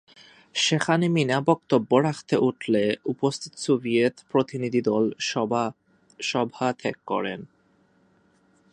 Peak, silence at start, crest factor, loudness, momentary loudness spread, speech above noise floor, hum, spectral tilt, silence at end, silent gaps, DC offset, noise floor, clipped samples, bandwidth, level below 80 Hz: -4 dBFS; 0.55 s; 20 dB; -24 LUFS; 7 LU; 39 dB; none; -5 dB/octave; 1.25 s; none; under 0.1%; -63 dBFS; under 0.1%; 11 kHz; -68 dBFS